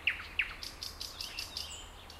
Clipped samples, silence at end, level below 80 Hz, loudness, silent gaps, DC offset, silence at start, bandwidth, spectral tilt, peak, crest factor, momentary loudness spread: under 0.1%; 0 s; -54 dBFS; -38 LUFS; none; under 0.1%; 0 s; 16 kHz; -0.5 dB/octave; -18 dBFS; 22 dB; 8 LU